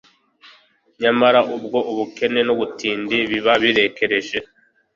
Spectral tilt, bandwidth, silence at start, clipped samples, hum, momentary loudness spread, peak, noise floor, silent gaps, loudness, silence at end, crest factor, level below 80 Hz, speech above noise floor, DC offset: -4.5 dB/octave; 7.6 kHz; 0.45 s; under 0.1%; none; 8 LU; -2 dBFS; -53 dBFS; none; -18 LUFS; 0.5 s; 18 dB; -60 dBFS; 35 dB; under 0.1%